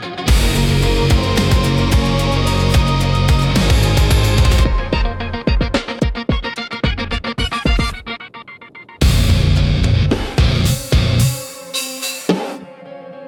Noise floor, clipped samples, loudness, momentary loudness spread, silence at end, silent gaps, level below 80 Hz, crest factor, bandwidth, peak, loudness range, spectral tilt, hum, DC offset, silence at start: -38 dBFS; under 0.1%; -16 LUFS; 13 LU; 0 s; none; -20 dBFS; 14 dB; 17.5 kHz; -2 dBFS; 5 LU; -5 dB/octave; none; under 0.1%; 0 s